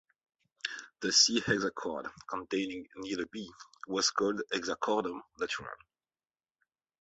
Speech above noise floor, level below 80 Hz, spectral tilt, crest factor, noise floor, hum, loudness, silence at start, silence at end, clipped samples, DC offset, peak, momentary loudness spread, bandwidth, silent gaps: over 57 dB; -70 dBFS; -2 dB/octave; 24 dB; under -90 dBFS; none; -32 LUFS; 0.65 s; 1.25 s; under 0.1%; under 0.1%; -12 dBFS; 17 LU; 8.2 kHz; none